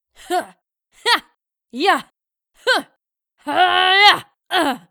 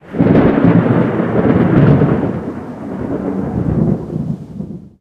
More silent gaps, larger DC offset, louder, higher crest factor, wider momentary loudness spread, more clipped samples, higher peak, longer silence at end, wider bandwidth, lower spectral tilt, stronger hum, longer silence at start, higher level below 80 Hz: neither; neither; second, -17 LUFS vs -14 LUFS; first, 20 dB vs 14 dB; about the same, 13 LU vs 15 LU; neither; about the same, 0 dBFS vs 0 dBFS; about the same, 0.15 s vs 0.1 s; first, over 20 kHz vs 5.2 kHz; second, -1 dB/octave vs -10.5 dB/octave; neither; first, 0.3 s vs 0.05 s; second, -64 dBFS vs -34 dBFS